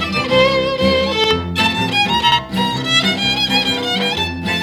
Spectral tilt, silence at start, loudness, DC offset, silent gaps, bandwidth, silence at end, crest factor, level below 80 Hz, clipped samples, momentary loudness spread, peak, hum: -4 dB/octave; 0 s; -15 LUFS; under 0.1%; none; 18 kHz; 0 s; 14 dB; -40 dBFS; under 0.1%; 4 LU; -2 dBFS; none